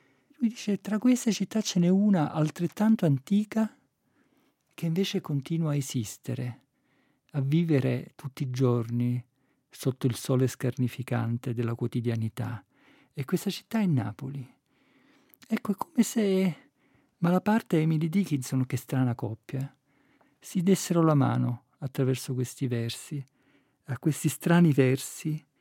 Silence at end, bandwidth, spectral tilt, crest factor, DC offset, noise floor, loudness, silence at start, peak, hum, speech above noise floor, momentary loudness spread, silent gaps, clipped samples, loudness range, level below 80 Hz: 0.2 s; 17 kHz; -6.5 dB/octave; 20 dB; under 0.1%; -70 dBFS; -28 LUFS; 0.4 s; -8 dBFS; none; 43 dB; 13 LU; none; under 0.1%; 5 LU; -76 dBFS